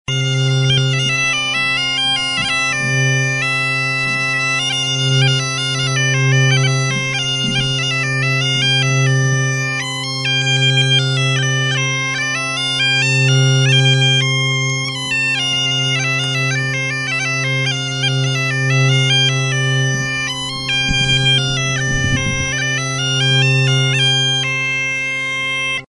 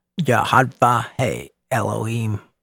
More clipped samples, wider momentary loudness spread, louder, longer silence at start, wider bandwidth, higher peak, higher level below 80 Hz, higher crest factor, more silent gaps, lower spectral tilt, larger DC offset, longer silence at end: neither; second, 5 LU vs 9 LU; first, -15 LUFS vs -20 LUFS; about the same, 0.1 s vs 0.15 s; second, 11.5 kHz vs 17.5 kHz; about the same, -2 dBFS vs 0 dBFS; first, -40 dBFS vs -54 dBFS; second, 14 dB vs 20 dB; neither; second, -3.5 dB/octave vs -5.5 dB/octave; neither; second, 0.05 s vs 0.25 s